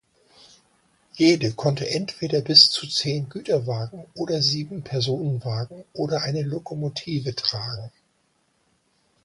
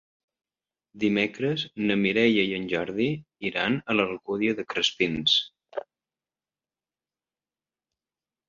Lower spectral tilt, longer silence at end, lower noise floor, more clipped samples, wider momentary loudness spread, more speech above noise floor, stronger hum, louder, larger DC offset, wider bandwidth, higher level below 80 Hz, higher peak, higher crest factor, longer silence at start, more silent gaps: about the same, -4.5 dB/octave vs -5 dB/octave; second, 1.35 s vs 2.7 s; second, -68 dBFS vs under -90 dBFS; neither; first, 15 LU vs 9 LU; second, 44 dB vs over 65 dB; second, none vs 50 Hz at -55 dBFS; first, -22 LUFS vs -25 LUFS; neither; first, 11.5 kHz vs 7.6 kHz; about the same, -60 dBFS vs -64 dBFS; first, 0 dBFS vs -8 dBFS; about the same, 24 dB vs 20 dB; first, 1.15 s vs 0.95 s; neither